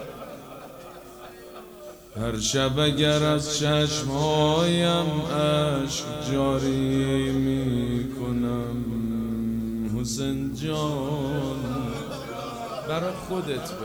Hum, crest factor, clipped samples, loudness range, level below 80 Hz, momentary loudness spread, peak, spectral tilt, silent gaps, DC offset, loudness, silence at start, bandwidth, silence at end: none; 18 dB; under 0.1%; 6 LU; -44 dBFS; 20 LU; -8 dBFS; -5 dB/octave; none; under 0.1%; -25 LUFS; 0 s; over 20 kHz; 0 s